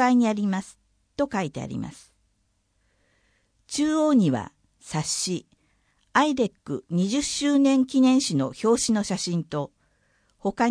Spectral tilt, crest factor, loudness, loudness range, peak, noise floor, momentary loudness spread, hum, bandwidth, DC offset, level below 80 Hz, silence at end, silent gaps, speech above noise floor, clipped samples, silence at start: -4.5 dB/octave; 18 dB; -24 LUFS; 8 LU; -6 dBFS; -70 dBFS; 14 LU; none; 10.5 kHz; under 0.1%; -60 dBFS; 0 s; none; 47 dB; under 0.1%; 0 s